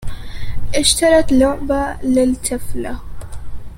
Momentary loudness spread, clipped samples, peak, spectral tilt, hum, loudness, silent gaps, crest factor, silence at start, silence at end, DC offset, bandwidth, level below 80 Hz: 21 LU; under 0.1%; 0 dBFS; -3.5 dB/octave; none; -16 LUFS; none; 16 dB; 0 s; 0 s; under 0.1%; 16 kHz; -28 dBFS